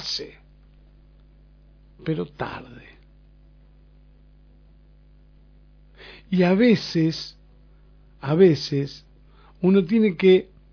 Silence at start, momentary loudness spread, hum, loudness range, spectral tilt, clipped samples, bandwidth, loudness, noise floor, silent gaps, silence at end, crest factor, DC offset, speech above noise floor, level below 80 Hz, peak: 0 s; 22 LU; 50 Hz at -50 dBFS; 14 LU; -7 dB/octave; under 0.1%; 5.4 kHz; -21 LUFS; -52 dBFS; none; 0.3 s; 20 dB; under 0.1%; 32 dB; -52 dBFS; -4 dBFS